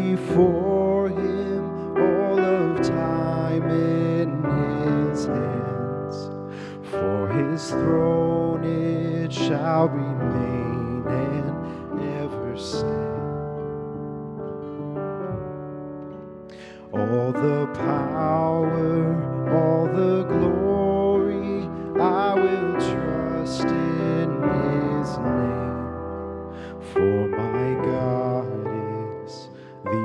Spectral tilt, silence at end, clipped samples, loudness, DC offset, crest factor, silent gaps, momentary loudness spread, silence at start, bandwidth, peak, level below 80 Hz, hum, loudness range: -8 dB/octave; 0 s; under 0.1%; -24 LUFS; under 0.1%; 18 dB; none; 12 LU; 0 s; 10.5 kHz; -6 dBFS; -50 dBFS; none; 8 LU